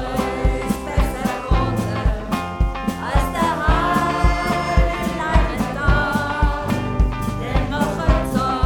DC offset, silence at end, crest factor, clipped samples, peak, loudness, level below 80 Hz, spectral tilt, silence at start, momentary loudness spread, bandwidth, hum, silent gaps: under 0.1%; 0 s; 16 dB; under 0.1%; -2 dBFS; -21 LUFS; -22 dBFS; -6 dB/octave; 0 s; 5 LU; 17.5 kHz; none; none